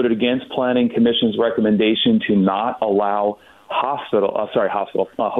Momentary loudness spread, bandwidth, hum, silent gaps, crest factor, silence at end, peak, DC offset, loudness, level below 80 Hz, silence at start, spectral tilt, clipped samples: 6 LU; 4.1 kHz; none; none; 12 dB; 0 s; -6 dBFS; under 0.1%; -19 LUFS; -58 dBFS; 0 s; -8.5 dB/octave; under 0.1%